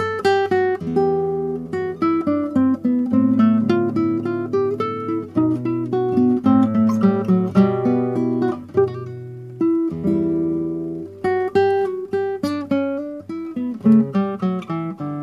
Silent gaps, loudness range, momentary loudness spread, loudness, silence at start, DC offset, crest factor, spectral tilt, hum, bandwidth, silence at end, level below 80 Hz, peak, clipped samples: none; 4 LU; 10 LU; -20 LUFS; 0 s; under 0.1%; 16 dB; -8.5 dB/octave; none; 11 kHz; 0 s; -58 dBFS; -2 dBFS; under 0.1%